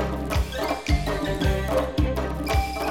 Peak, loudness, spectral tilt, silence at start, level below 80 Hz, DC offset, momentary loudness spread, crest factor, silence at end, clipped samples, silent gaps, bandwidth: -10 dBFS; -25 LUFS; -6 dB/octave; 0 s; -28 dBFS; 0.3%; 3 LU; 14 dB; 0 s; under 0.1%; none; 17 kHz